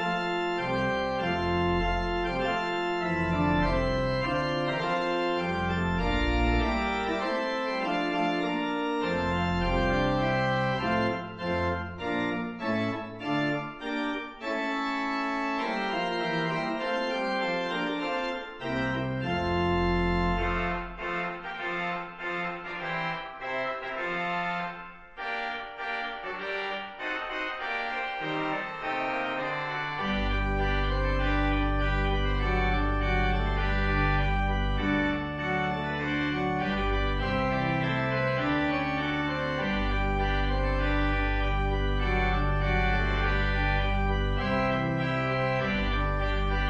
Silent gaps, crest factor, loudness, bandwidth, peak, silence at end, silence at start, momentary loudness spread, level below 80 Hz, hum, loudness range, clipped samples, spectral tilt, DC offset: none; 14 dB; -29 LUFS; 7.4 kHz; -14 dBFS; 0 s; 0 s; 6 LU; -34 dBFS; none; 5 LU; under 0.1%; -6.5 dB/octave; under 0.1%